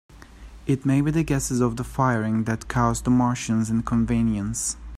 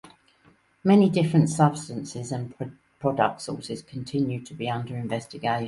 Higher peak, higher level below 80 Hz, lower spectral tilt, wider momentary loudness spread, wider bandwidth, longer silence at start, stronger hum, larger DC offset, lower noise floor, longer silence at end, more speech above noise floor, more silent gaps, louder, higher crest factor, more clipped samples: about the same, -6 dBFS vs -6 dBFS; first, -40 dBFS vs -62 dBFS; about the same, -6 dB/octave vs -6.5 dB/octave; second, 5 LU vs 15 LU; first, 14.5 kHz vs 11.5 kHz; about the same, 0.15 s vs 0.05 s; neither; neither; second, -43 dBFS vs -61 dBFS; about the same, 0 s vs 0 s; second, 21 dB vs 36 dB; neither; about the same, -23 LUFS vs -25 LUFS; about the same, 16 dB vs 18 dB; neither